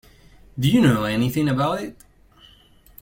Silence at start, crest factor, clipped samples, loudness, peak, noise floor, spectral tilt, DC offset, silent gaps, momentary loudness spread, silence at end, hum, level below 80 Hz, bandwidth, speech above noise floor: 0.55 s; 18 dB; under 0.1%; -20 LUFS; -4 dBFS; -52 dBFS; -6.5 dB/octave; under 0.1%; none; 15 LU; 1.1 s; none; -48 dBFS; 17 kHz; 33 dB